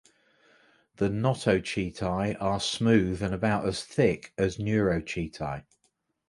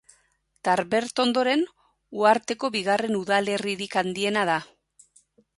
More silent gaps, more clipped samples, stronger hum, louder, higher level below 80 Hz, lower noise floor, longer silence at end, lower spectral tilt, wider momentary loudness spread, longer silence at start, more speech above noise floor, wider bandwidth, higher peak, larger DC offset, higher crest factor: neither; neither; neither; second, -28 LUFS vs -24 LUFS; first, -50 dBFS vs -68 dBFS; first, -74 dBFS vs -67 dBFS; second, 0.7 s vs 0.95 s; first, -6 dB/octave vs -4 dB/octave; first, 9 LU vs 6 LU; first, 1 s vs 0.65 s; about the same, 47 dB vs 44 dB; about the same, 11.5 kHz vs 11.5 kHz; second, -10 dBFS vs -6 dBFS; neither; about the same, 20 dB vs 20 dB